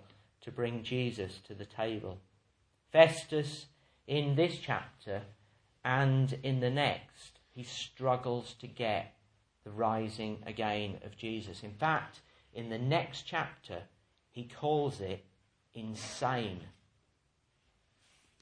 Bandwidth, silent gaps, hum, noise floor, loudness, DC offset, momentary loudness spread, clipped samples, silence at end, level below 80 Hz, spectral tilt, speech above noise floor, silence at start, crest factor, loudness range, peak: 10.5 kHz; none; none; -75 dBFS; -34 LUFS; under 0.1%; 18 LU; under 0.1%; 1.7 s; -70 dBFS; -6 dB/octave; 41 dB; 0.4 s; 28 dB; 6 LU; -8 dBFS